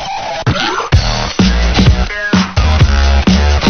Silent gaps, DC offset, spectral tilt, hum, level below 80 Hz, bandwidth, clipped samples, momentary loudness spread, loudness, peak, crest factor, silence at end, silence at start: none; under 0.1%; -5.5 dB/octave; none; -14 dBFS; 6.8 kHz; 0.2%; 5 LU; -12 LUFS; 0 dBFS; 10 dB; 0 s; 0 s